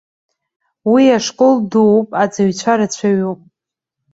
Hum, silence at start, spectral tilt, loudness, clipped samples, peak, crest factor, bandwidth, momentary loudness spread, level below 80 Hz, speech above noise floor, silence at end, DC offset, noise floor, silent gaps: none; 0.85 s; -5.5 dB/octave; -14 LUFS; under 0.1%; -2 dBFS; 14 dB; 8 kHz; 8 LU; -60 dBFS; 70 dB; 0.8 s; under 0.1%; -83 dBFS; none